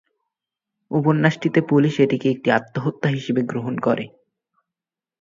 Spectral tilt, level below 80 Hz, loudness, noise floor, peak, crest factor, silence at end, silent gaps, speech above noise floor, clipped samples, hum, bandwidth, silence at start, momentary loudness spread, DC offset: -7.5 dB/octave; -64 dBFS; -20 LUFS; -88 dBFS; 0 dBFS; 20 dB; 1.15 s; none; 69 dB; under 0.1%; none; 7.6 kHz; 0.9 s; 8 LU; under 0.1%